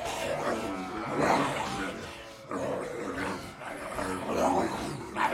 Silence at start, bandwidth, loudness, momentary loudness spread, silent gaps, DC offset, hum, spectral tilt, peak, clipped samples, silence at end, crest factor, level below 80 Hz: 0 s; 16.5 kHz; -32 LUFS; 12 LU; none; under 0.1%; none; -4.5 dB/octave; -12 dBFS; under 0.1%; 0 s; 20 dB; -56 dBFS